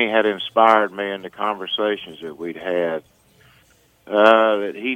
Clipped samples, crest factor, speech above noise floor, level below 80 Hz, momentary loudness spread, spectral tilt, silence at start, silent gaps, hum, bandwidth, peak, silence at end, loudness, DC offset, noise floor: under 0.1%; 20 dB; 37 dB; -66 dBFS; 16 LU; -5 dB/octave; 0 s; none; none; 9.8 kHz; 0 dBFS; 0 s; -19 LUFS; under 0.1%; -56 dBFS